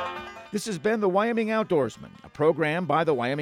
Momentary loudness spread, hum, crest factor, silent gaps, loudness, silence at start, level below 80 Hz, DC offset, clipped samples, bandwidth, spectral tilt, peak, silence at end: 11 LU; none; 16 dB; none; -25 LUFS; 0 s; -64 dBFS; under 0.1%; under 0.1%; 15.5 kHz; -6 dB/octave; -10 dBFS; 0 s